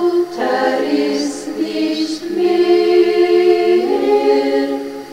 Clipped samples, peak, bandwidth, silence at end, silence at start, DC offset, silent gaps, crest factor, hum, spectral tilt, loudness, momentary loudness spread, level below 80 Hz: under 0.1%; -2 dBFS; 12 kHz; 0 s; 0 s; under 0.1%; none; 12 dB; none; -4 dB/octave; -15 LUFS; 8 LU; -58 dBFS